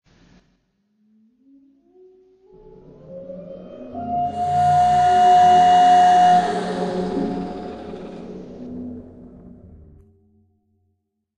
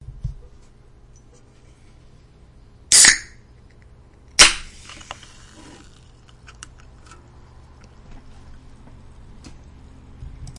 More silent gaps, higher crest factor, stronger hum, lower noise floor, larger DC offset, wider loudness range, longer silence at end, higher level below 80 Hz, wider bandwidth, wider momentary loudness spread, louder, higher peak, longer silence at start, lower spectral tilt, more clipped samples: neither; second, 16 dB vs 24 dB; neither; first, -72 dBFS vs -49 dBFS; neither; first, 22 LU vs 4 LU; first, 2.1 s vs 0.1 s; second, -54 dBFS vs -42 dBFS; second, 10 kHz vs 12 kHz; second, 24 LU vs 30 LU; second, -16 LUFS vs -12 LUFS; second, -6 dBFS vs 0 dBFS; first, 3.1 s vs 0.25 s; first, -5.5 dB/octave vs 1 dB/octave; neither